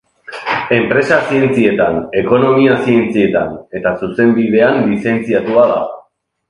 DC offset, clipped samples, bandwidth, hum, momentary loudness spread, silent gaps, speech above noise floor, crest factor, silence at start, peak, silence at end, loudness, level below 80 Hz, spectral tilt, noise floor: under 0.1%; under 0.1%; 10.5 kHz; none; 8 LU; none; 38 dB; 12 dB; 0.3 s; 0 dBFS; 0.5 s; -13 LUFS; -48 dBFS; -7.5 dB/octave; -50 dBFS